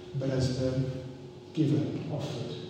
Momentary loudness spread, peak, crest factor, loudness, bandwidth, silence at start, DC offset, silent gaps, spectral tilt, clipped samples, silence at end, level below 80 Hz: 12 LU; -16 dBFS; 16 dB; -31 LUFS; 9.6 kHz; 0 s; under 0.1%; none; -7.5 dB/octave; under 0.1%; 0 s; -56 dBFS